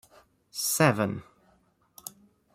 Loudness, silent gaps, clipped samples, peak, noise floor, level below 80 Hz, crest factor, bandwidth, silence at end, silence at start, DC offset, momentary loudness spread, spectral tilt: -26 LUFS; none; under 0.1%; -8 dBFS; -66 dBFS; -66 dBFS; 24 dB; 16 kHz; 0.45 s; 0.55 s; under 0.1%; 21 LU; -4 dB/octave